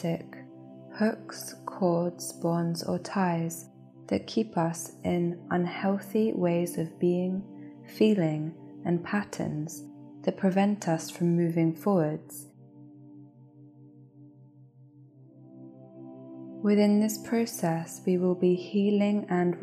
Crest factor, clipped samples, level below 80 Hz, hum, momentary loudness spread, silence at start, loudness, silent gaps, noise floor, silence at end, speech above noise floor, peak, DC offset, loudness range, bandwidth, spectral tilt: 18 dB; under 0.1%; -74 dBFS; none; 20 LU; 0 s; -29 LUFS; none; -55 dBFS; 0 s; 27 dB; -12 dBFS; under 0.1%; 4 LU; 15 kHz; -6.5 dB/octave